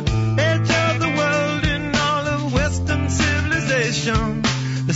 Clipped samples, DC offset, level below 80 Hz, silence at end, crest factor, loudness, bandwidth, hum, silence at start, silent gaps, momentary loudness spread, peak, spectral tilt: under 0.1%; under 0.1%; -32 dBFS; 0 s; 12 dB; -19 LUFS; 8 kHz; none; 0 s; none; 3 LU; -6 dBFS; -5 dB/octave